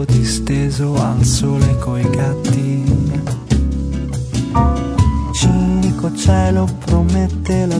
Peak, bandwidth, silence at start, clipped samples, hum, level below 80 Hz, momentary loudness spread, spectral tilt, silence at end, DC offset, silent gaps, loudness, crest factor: 0 dBFS; 11 kHz; 0 s; under 0.1%; none; -24 dBFS; 5 LU; -6.5 dB/octave; 0 s; under 0.1%; none; -16 LUFS; 14 dB